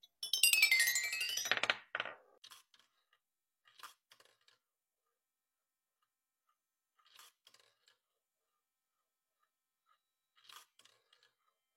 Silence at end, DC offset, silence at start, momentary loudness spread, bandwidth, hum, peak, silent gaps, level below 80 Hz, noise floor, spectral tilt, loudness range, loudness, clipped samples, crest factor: 1.15 s; under 0.1%; 0.2 s; 16 LU; 16.5 kHz; none; -12 dBFS; 2.38-2.42 s; under -90 dBFS; under -90 dBFS; 3 dB/octave; 29 LU; -32 LUFS; under 0.1%; 32 dB